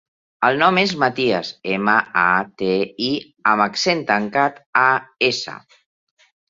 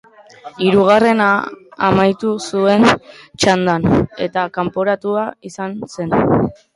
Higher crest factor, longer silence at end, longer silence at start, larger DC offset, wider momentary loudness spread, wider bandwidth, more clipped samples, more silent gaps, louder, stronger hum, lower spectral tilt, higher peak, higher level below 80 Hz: about the same, 18 dB vs 16 dB; first, 0.9 s vs 0.25 s; about the same, 0.4 s vs 0.45 s; neither; second, 7 LU vs 14 LU; second, 7.8 kHz vs 11.5 kHz; neither; first, 4.66-4.73 s vs none; second, -18 LUFS vs -15 LUFS; neither; second, -4 dB/octave vs -5.5 dB/octave; about the same, -2 dBFS vs 0 dBFS; second, -62 dBFS vs -44 dBFS